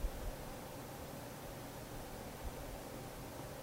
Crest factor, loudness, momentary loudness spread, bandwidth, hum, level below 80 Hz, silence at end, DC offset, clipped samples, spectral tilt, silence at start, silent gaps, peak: 20 dB; -48 LUFS; 1 LU; 16 kHz; none; -50 dBFS; 0 s; under 0.1%; under 0.1%; -4.5 dB/octave; 0 s; none; -28 dBFS